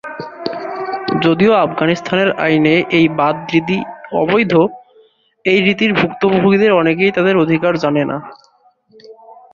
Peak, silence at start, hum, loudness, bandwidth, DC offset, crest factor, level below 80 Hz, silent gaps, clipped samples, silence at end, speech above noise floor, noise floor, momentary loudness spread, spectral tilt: 0 dBFS; 0.05 s; none; -14 LUFS; 7.2 kHz; under 0.1%; 14 dB; -54 dBFS; none; under 0.1%; 0.2 s; 40 dB; -53 dBFS; 10 LU; -7 dB/octave